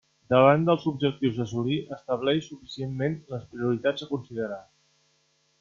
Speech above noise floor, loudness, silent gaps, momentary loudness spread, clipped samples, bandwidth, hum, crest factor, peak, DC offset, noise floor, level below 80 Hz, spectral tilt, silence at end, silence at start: 43 dB; -26 LUFS; none; 16 LU; under 0.1%; 7.2 kHz; none; 22 dB; -6 dBFS; under 0.1%; -68 dBFS; -64 dBFS; -7 dB/octave; 1 s; 0.3 s